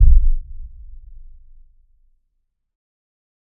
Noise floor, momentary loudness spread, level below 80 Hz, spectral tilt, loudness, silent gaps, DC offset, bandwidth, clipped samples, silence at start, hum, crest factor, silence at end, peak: -70 dBFS; 28 LU; -18 dBFS; -16 dB/octave; -21 LUFS; none; under 0.1%; 0.2 kHz; under 0.1%; 0 s; none; 18 dB; 2.85 s; 0 dBFS